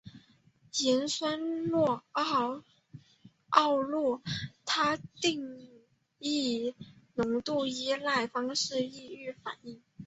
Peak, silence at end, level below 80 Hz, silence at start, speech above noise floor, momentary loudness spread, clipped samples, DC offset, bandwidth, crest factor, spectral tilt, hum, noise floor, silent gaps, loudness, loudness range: -6 dBFS; 0 s; -68 dBFS; 0.05 s; 33 dB; 14 LU; under 0.1%; under 0.1%; 8.2 kHz; 26 dB; -3.5 dB/octave; none; -64 dBFS; none; -31 LUFS; 3 LU